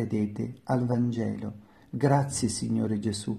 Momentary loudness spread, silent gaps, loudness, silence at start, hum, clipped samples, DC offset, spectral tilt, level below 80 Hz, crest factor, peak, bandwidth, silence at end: 11 LU; none; -28 LUFS; 0 s; none; under 0.1%; under 0.1%; -6 dB/octave; -58 dBFS; 18 dB; -10 dBFS; 13 kHz; 0 s